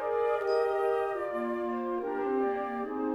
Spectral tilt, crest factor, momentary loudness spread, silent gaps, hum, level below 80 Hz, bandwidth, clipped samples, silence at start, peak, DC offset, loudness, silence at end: -6 dB/octave; 12 dB; 5 LU; none; none; -66 dBFS; 12 kHz; under 0.1%; 0 s; -18 dBFS; under 0.1%; -31 LUFS; 0 s